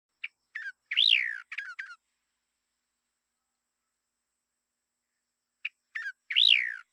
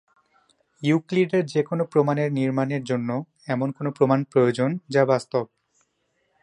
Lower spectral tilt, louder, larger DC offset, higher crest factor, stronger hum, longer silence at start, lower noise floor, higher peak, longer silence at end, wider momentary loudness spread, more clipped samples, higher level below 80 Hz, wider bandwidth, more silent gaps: second, 7.5 dB/octave vs -7.5 dB/octave; about the same, -23 LUFS vs -23 LUFS; neither; first, 24 dB vs 18 dB; neither; second, 0.25 s vs 0.8 s; first, -85 dBFS vs -71 dBFS; about the same, -8 dBFS vs -6 dBFS; second, 0.15 s vs 1 s; first, 22 LU vs 8 LU; neither; second, under -90 dBFS vs -70 dBFS; first, 15.5 kHz vs 11 kHz; neither